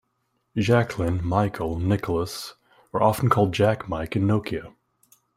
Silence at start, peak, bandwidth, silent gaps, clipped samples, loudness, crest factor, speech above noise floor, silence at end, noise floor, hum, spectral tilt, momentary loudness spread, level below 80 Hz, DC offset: 0.55 s; -4 dBFS; 16 kHz; none; under 0.1%; -24 LUFS; 20 dB; 50 dB; 0.65 s; -73 dBFS; none; -7 dB/octave; 12 LU; -48 dBFS; under 0.1%